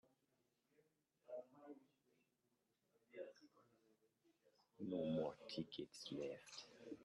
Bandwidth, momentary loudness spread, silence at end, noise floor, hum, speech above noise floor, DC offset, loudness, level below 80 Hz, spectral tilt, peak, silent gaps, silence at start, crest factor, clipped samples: 11.5 kHz; 18 LU; 0 s; -87 dBFS; none; 39 dB; under 0.1%; -51 LUFS; -88 dBFS; -5.5 dB/octave; -32 dBFS; none; 1.3 s; 20 dB; under 0.1%